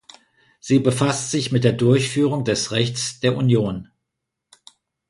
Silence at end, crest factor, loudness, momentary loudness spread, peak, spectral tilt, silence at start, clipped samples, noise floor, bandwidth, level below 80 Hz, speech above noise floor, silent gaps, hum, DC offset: 1.25 s; 20 dB; -20 LUFS; 5 LU; -2 dBFS; -5.5 dB/octave; 0.65 s; under 0.1%; -81 dBFS; 11.5 kHz; -54 dBFS; 61 dB; none; none; under 0.1%